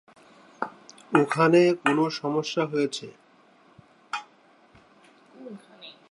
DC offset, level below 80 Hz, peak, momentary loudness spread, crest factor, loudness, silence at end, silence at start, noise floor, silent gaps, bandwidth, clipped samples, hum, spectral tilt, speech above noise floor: under 0.1%; -76 dBFS; -4 dBFS; 25 LU; 24 dB; -25 LUFS; 0.2 s; 0.6 s; -58 dBFS; none; 11.5 kHz; under 0.1%; none; -5.5 dB/octave; 35 dB